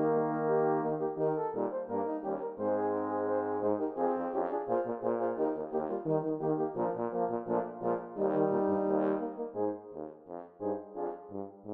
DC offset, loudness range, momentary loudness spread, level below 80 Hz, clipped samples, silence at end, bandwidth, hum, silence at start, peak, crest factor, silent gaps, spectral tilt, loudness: under 0.1%; 1 LU; 10 LU; -76 dBFS; under 0.1%; 0 s; 3.4 kHz; none; 0 s; -16 dBFS; 16 dB; none; -11.5 dB/octave; -33 LUFS